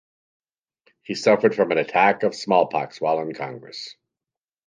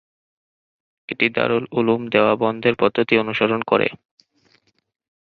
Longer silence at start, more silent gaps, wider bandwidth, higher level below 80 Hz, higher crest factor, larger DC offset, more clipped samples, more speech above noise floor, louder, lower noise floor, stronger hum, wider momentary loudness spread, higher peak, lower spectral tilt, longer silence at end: about the same, 1.1 s vs 1.1 s; neither; first, 9.6 kHz vs 6 kHz; second, -72 dBFS vs -60 dBFS; about the same, 20 dB vs 20 dB; neither; neither; first, 69 dB vs 43 dB; about the same, -21 LUFS vs -19 LUFS; first, -90 dBFS vs -62 dBFS; neither; first, 16 LU vs 3 LU; about the same, -4 dBFS vs -2 dBFS; second, -5 dB/octave vs -8 dB/octave; second, 0.75 s vs 1.25 s